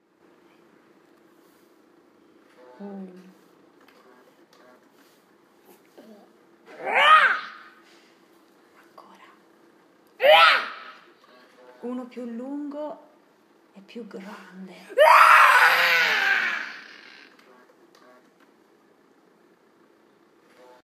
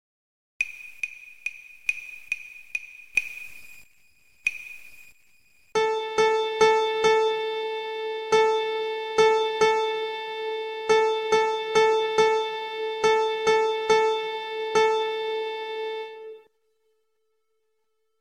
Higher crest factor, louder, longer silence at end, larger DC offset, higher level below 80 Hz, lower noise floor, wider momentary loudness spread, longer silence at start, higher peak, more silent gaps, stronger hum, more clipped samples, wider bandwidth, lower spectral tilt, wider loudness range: about the same, 22 dB vs 20 dB; first, -17 LUFS vs -25 LUFS; first, 4.05 s vs 1.85 s; neither; second, under -90 dBFS vs -68 dBFS; second, -59 dBFS vs -77 dBFS; first, 29 LU vs 14 LU; first, 2.8 s vs 0.6 s; first, -2 dBFS vs -6 dBFS; neither; neither; neither; first, 15.5 kHz vs 12 kHz; about the same, -1.5 dB/octave vs -2 dB/octave; first, 19 LU vs 9 LU